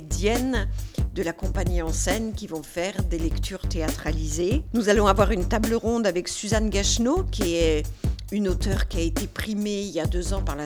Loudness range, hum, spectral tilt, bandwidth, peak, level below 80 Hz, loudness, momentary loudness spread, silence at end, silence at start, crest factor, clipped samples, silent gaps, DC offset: 5 LU; none; -5 dB/octave; over 20 kHz; -4 dBFS; -30 dBFS; -25 LUFS; 8 LU; 0 s; 0 s; 20 dB; under 0.1%; none; under 0.1%